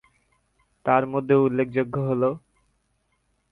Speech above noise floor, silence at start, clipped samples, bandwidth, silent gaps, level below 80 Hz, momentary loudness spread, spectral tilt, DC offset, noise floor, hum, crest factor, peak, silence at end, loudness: 49 dB; 0.85 s; under 0.1%; 4.1 kHz; none; -62 dBFS; 7 LU; -10 dB/octave; under 0.1%; -71 dBFS; none; 20 dB; -6 dBFS; 1.15 s; -23 LUFS